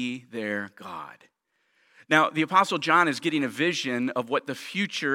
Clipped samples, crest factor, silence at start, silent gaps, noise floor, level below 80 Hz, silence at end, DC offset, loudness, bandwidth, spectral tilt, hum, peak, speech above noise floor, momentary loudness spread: under 0.1%; 22 dB; 0 s; none; -70 dBFS; -80 dBFS; 0 s; under 0.1%; -25 LUFS; 16.5 kHz; -4 dB/octave; none; -4 dBFS; 44 dB; 16 LU